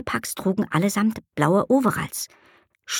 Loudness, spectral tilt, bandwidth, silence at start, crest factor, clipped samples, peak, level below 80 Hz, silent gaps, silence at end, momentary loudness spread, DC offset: -23 LUFS; -5 dB/octave; 18 kHz; 0 s; 20 dB; under 0.1%; -4 dBFS; -56 dBFS; none; 0 s; 10 LU; under 0.1%